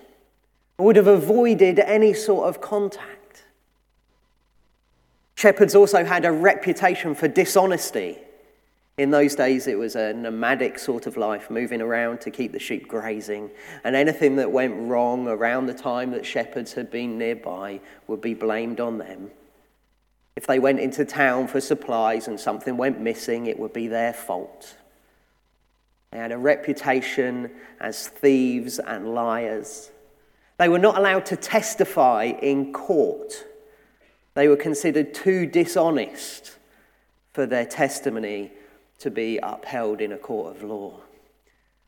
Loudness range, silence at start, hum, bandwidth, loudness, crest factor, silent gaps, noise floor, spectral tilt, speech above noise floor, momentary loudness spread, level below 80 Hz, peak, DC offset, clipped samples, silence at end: 9 LU; 0.8 s; none; 18.5 kHz; -22 LUFS; 22 dB; none; -66 dBFS; -5 dB/octave; 44 dB; 17 LU; -66 dBFS; 0 dBFS; under 0.1%; under 0.1%; 0.9 s